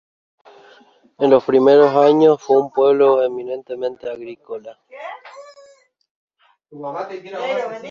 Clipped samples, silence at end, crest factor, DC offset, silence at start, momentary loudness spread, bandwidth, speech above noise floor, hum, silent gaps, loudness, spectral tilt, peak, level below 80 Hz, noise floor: under 0.1%; 0 s; 16 dB; under 0.1%; 1.2 s; 21 LU; 7 kHz; 35 dB; none; 6.11-6.28 s; -16 LUFS; -6.5 dB/octave; -2 dBFS; -68 dBFS; -51 dBFS